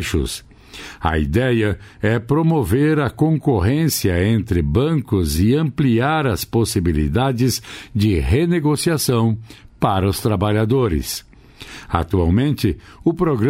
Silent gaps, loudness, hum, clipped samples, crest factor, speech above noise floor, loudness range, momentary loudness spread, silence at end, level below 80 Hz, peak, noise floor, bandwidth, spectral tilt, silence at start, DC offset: none; -18 LUFS; none; under 0.1%; 16 dB; 22 dB; 2 LU; 7 LU; 0 s; -32 dBFS; -2 dBFS; -39 dBFS; 16 kHz; -6 dB/octave; 0 s; under 0.1%